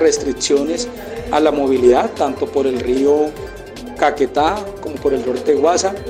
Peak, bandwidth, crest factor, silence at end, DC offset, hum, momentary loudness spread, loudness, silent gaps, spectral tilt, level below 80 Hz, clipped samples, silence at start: 0 dBFS; 15.5 kHz; 16 dB; 0 s; under 0.1%; none; 13 LU; -16 LUFS; none; -4 dB/octave; -40 dBFS; under 0.1%; 0 s